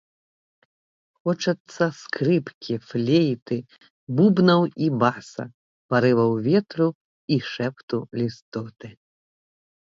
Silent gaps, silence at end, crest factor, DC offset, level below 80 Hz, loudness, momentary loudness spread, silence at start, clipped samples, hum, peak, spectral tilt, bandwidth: 1.60-1.65 s, 2.54-2.61 s, 3.42-3.46 s, 3.90-4.07 s, 5.54-5.89 s, 6.95-7.28 s, 7.83-7.88 s, 8.42-8.52 s; 1 s; 20 dB; under 0.1%; -66 dBFS; -23 LUFS; 15 LU; 1.25 s; under 0.1%; none; -4 dBFS; -7 dB/octave; 7.8 kHz